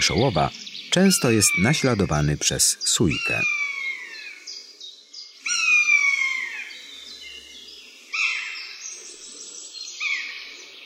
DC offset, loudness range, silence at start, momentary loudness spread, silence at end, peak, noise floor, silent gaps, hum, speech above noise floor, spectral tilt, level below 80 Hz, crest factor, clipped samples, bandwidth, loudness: under 0.1%; 10 LU; 0 s; 21 LU; 0 s; -6 dBFS; -44 dBFS; none; none; 24 dB; -3 dB/octave; -48 dBFS; 18 dB; under 0.1%; 16 kHz; -20 LUFS